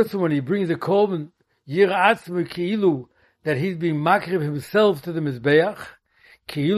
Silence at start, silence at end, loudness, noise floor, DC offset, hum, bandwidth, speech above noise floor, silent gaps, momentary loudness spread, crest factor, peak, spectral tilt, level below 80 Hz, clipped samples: 0 s; 0 s; -21 LUFS; -55 dBFS; under 0.1%; none; 13.5 kHz; 35 dB; none; 12 LU; 20 dB; -2 dBFS; -7 dB/octave; -64 dBFS; under 0.1%